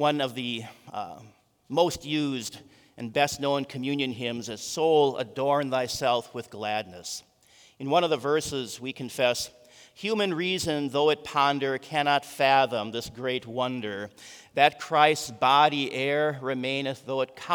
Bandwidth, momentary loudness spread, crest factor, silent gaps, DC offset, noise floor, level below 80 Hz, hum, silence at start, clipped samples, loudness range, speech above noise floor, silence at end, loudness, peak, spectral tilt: over 20 kHz; 14 LU; 22 dB; none; under 0.1%; -58 dBFS; -64 dBFS; none; 0 s; under 0.1%; 5 LU; 32 dB; 0 s; -26 LUFS; -4 dBFS; -4 dB/octave